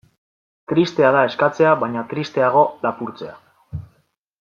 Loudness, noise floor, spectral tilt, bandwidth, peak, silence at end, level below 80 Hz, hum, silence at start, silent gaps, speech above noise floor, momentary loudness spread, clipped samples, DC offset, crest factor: -18 LUFS; -64 dBFS; -6.5 dB/octave; 7.2 kHz; -2 dBFS; 0.55 s; -56 dBFS; none; 0.7 s; none; 46 dB; 20 LU; under 0.1%; under 0.1%; 18 dB